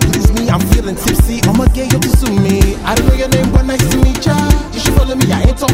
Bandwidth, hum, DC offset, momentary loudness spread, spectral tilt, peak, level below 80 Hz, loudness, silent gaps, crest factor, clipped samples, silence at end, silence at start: 16.5 kHz; none; 0.4%; 2 LU; -5.5 dB/octave; 0 dBFS; -14 dBFS; -12 LUFS; none; 10 dB; 0.5%; 0 s; 0 s